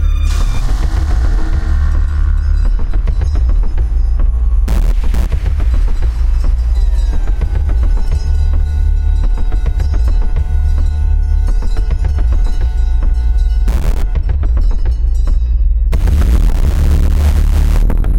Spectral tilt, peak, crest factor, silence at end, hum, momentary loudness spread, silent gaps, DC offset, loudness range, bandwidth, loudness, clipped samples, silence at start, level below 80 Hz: -7 dB/octave; -4 dBFS; 8 dB; 0 s; none; 4 LU; none; under 0.1%; 2 LU; 8.6 kHz; -16 LUFS; under 0.1%; 0 s; -10 dBFS